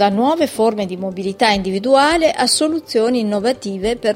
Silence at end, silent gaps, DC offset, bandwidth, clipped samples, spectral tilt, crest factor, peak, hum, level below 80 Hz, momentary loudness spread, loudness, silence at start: 0 s; none; under 0.1%; 16.5 kHz; under 0.1%; -4 dB/octave; 16 dB; 0 dBFS; none; -46 dBFS; 8 LU; -16 LUFS; 0 s